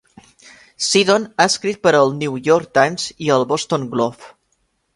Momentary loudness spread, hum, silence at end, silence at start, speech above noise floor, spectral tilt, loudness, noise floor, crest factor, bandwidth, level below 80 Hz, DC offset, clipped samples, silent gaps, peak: 7 LU; none; 0.65 s; 0.8 s; 50 dB; -3.5 dB/octave; -17 LUFS; -66 dBFS; 18 dB; 11.5 kHz; -60 dBFS; under 0.1%; under 0.1%; none; 0 dBFS